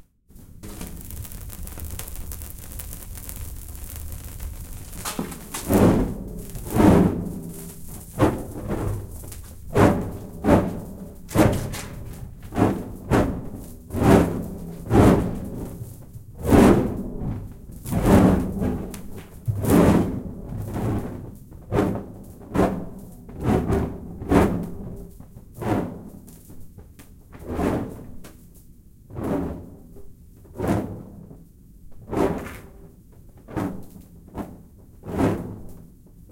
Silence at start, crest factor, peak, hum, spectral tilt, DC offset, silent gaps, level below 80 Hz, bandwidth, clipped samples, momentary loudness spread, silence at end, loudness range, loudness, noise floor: 0.35 s; 22 dB; -2 dBFS; none; -7 dB/octave; under 0.1%; none; -36 dBFS; 17 kHz; under 0.1%; 23 LU; 0.05 s; 12 LU; -23 LUFS; -48 dBFS